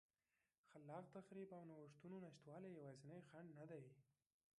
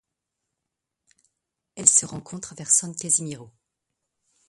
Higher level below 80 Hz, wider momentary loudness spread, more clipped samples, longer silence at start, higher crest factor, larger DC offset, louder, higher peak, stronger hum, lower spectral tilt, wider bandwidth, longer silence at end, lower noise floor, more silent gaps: second, under -90 dBFS vs -68 dBFS; second, 4 LU vs 19 LU; neither; second, 0.65 s vs 1.75 s; second, 18 dB vs 28 dB; neither; second, -60 LUFS vs -20 LUFS; second, -42 dBFS vs 0 dBFS; neither; first, -7.5 dB/octave vs -2 dB/octave; second, 10.5 kHz vs 12 kHz; second, 0.55 s vs 1.05 s; first, under -90 dBFS vs -84 dBFS; neither